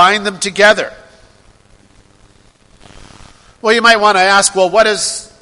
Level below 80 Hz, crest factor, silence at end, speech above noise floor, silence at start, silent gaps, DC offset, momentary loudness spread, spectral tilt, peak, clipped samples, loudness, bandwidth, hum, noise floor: -48 dBFS; 14 dB; 0.15 s; 36 dB; 0 s; none; under 0.1%; 10 LU; -1.5 dB/octave; 0 dBFS; 0.2%; -10 LUFS; 12 kHz; none; -47 dBFS